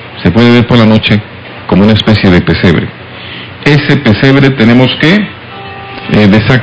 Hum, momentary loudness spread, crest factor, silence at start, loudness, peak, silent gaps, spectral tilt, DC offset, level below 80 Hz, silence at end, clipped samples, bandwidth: none; 17 LU; 8 dB; 0 s; -7 LUFS; 0 dBFS; none; -7.5 dB/octave; 0.7%; -28 dBFS; 0 s; 5%; 8 kHz